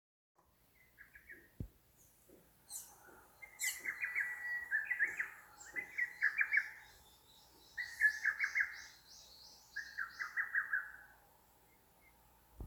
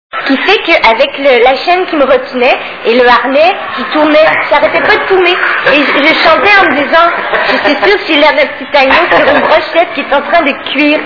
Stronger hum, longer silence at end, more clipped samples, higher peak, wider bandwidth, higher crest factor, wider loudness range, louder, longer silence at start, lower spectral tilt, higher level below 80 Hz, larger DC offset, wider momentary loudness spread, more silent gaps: first, 60 Hz at -80 dBFS vs none; about the same, 0 s vs 0 s; second, under 0.1% vs 3%; second, -20 dBFS vs 0 dBFS; first, over 20 kHz vs 5.4 kHz; first, 22 dB vs 8 dB; first, 10 LU vs 2 LU; second, -38 LUFS vs -7 LUFS; first, 1 s vs 0.15 s; second, -0.5 dB/octave vs -4.5 dB/octave; second, -70 dBFS vs -40 dBFS; neither; first, 23 LU vs 5 LU; neither